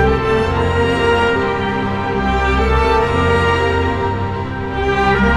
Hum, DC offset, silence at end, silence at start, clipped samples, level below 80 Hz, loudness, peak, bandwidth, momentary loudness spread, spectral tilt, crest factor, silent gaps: none; under 0.1%; 0 s; 0 s; under 0.1%; -24 dBFS; -16 LUFS; -2 dBFS; 11 kHz; 5 LU; -6.5 dB/octave; 14 dB; none